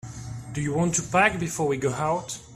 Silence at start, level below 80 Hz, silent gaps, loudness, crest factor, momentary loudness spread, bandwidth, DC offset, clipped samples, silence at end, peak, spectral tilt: 0.05 s; -50 dBFS; none; -25 LUFS; 20 dB; 13 LU; 15 kHz; under 0.1%; under 0.1%; 0 s; -6 dBFS; -4.5 dB/octave